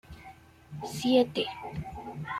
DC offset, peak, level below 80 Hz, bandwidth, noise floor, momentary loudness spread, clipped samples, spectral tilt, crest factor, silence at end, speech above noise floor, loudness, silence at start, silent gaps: under 0.1%; -12 dBFS; -56 dBFS; 15 kHz; -52 dBFS; 24 LU; under 0.1%; -5.5 dB/octave; 20 dB; 0 s; 22 dB; -30 LUFS; 0.1 s; none